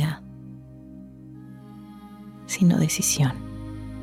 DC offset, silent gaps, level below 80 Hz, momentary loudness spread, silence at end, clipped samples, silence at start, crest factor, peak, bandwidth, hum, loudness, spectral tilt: under 0.1%; none; -50 dBFS; 23 LU; 0 s; under 0.1%; 0 s; 16 dB; -10 dBFS; 16.5 kHz; none; -23 LUFS; -4.5 dB/octave